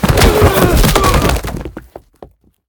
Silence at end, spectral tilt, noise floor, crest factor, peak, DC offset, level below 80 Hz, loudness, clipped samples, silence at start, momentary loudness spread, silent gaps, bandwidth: 0.45 s; -5 dB/octave; -40 dBFS; 12 dB; 0 dBFS; under 0.1%; -18 dBFS; -11 LUFS; 0.2%; 0 s; 16 LU; none; over 20 kHz